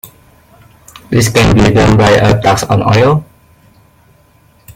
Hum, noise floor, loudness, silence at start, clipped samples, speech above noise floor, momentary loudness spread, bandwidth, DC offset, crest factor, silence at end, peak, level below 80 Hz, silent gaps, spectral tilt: none; -47 dBFS; -9 LUFS; 0.05 s; under 0.1%; 39 dB; 5 LU; 16.5 kHz; under 0.1%; 12 dB; 0.05 s; 0 dBFS; -28 dBFS; none; -5.5 dB/octave